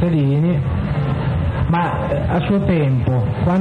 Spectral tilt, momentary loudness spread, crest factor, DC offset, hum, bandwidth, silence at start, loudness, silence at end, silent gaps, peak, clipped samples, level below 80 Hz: -9.5 dB/octave; 4 LU; 12 dB; under 0.1%; none; 4.7 kHz; 0 s; -18 LUFS; 0 s; none; -4 dBFS; under 0.1%; -30 dBFS